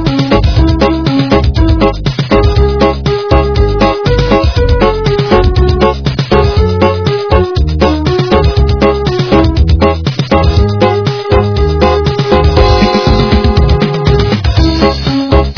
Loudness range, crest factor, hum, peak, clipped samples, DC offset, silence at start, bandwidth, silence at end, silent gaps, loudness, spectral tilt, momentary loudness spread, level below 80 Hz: 1 LU; 8 dB; none; 0 dBFS; 0.8%; 0.6%; 0 s; 5.4 kHz; 0 s; none; -10 LUFS; -7.5 dB/octave; 3 LU; -14 dBFS